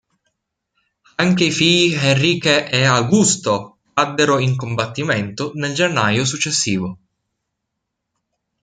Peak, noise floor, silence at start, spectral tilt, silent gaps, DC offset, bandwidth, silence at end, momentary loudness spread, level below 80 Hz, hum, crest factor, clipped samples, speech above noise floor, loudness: 0 dBFS; -78 dBFS; 1.2 s; -4 dB/octave; none; under 0.1%; 9.6 kHz; 1.7 s; 9 LU; -56 dBFS; none; 18 dB; under 0.1%; 61 dB; -16 LUFS